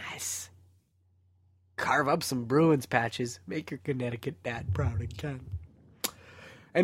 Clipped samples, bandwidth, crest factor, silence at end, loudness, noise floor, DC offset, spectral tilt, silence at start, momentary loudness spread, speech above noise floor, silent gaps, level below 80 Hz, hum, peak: under 0.1%; 16 kHz; 24 dB; 0 s; -31 LUFS; -68 dBFS; under 0.1%; -5 dB/octave; 0 s; 18 LU; 38 dB; none; -52 dBFS; none; -8 dBFS